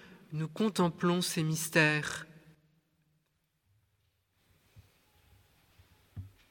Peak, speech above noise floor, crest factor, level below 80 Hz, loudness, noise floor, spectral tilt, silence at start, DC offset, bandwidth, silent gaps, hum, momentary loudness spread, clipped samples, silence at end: -10 dBFS; 47 dB; 26 dB; -68 dBFS; -31 LUFS; -78 dBFS; -4.5 dB/octave; 0 s; under 0.1%; 17 kHz; none; none; 24 LU; under 0.1%; 0.25 s